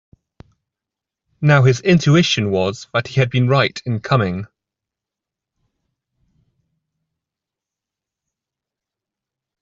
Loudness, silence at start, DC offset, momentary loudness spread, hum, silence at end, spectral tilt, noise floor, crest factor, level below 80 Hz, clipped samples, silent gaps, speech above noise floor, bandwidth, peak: -16 LUFS; 1.4 s; under 0.1%; 10 LU; none; 5.15 s; -6 dB/octave; -86 dBFS; 18 dB; -54 dBFS; under 0.1%; none; 70 dB; 7.6 kHz; -2 dBFS